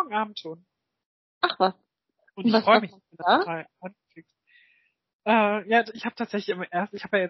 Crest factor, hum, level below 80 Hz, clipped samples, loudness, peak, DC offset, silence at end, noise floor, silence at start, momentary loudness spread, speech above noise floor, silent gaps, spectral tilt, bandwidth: 22 dB; none; -78 dBFS; under 0.1%; -25 LUFS; -4 dBFS; under 0.1%; 0 s; -69 dBFS; 0 s; 18 LU; 45 dB; 1.06-1.41 s, 5.13-5.19 s; -2.5 dB/octave; 6 kHz